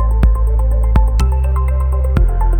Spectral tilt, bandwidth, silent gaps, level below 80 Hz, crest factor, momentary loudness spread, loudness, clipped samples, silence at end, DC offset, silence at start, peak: -8 dB/octave; 8.8 kHz; none; -12 dBFS; 12 dB; 2 LU; -15 LUFS; under 0.1%; 0 s; under 0.1%; 0 s; 0 dBFS